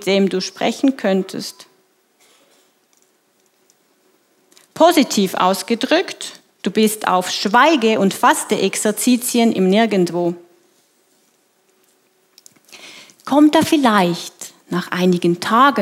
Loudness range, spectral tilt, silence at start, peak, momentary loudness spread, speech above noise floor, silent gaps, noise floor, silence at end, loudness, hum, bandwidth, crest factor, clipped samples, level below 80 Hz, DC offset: 9 LU; -4.5 dB/octave; 0 s; 0 dBFS; 16 LU; 45 dB; none; -60 dBFS; 0 s; -16 LUFS; none; 16.5 kHz; 18 dB; under 0.1%; -70 dBFS; under 0.1%